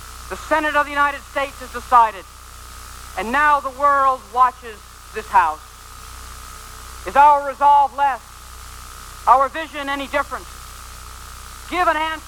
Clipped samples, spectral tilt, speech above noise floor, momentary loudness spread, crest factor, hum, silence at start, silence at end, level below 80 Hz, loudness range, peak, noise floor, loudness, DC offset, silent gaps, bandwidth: under 0.1%; -3 dB/octave; 20 dB; 22 LU; 20 dB; none; 0 s; 0 s; -42 dBFS; 5 LU; 0 dBFS; -38 dBFS; -18 LUFS; under 0.1%; none; 18.5 kHz